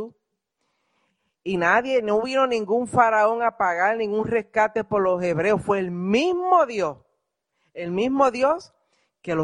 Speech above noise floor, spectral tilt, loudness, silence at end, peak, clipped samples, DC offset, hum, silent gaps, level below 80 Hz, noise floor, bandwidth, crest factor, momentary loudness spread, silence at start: 55 dB; -5.5 dB/octave; -22 LUFS; 0 s; -4 dBFS; under 0.1%; under 0.1%; none; none; -60 dBFS; -77 dBFS; 11 kHz; 20 dB; 10 LU; 0 s